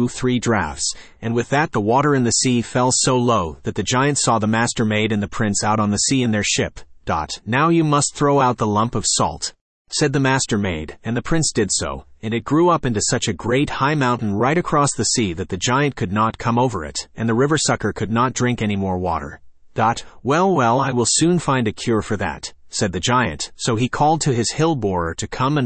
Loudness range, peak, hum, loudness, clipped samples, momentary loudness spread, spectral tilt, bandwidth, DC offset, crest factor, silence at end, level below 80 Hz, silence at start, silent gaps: 2 LU; -4 dBFS; none; -19 LUFS; under 0.1%; 9 LU; -4.5 dB/octave; 8.8 kHz; under 0.1%; 14 dB; 0 s; -44 dBFS; 0 s; 9.61-9.85 s